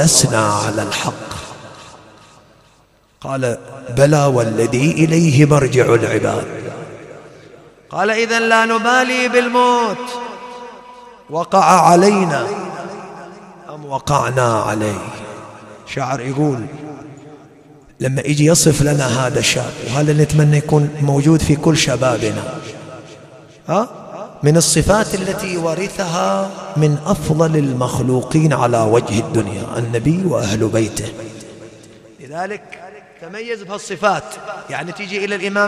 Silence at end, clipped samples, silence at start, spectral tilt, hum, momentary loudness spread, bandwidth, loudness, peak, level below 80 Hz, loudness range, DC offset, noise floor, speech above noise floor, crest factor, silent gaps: 0 s; under 0.1%; 0 s; -5 dB/octave; none; 21 LU; 14.5 kHz; -15 LUFS; 0 dBFS; -42 dBFS; 9 LU; under 0.1%; -53 dBFS; 38 dB; 16 dB; none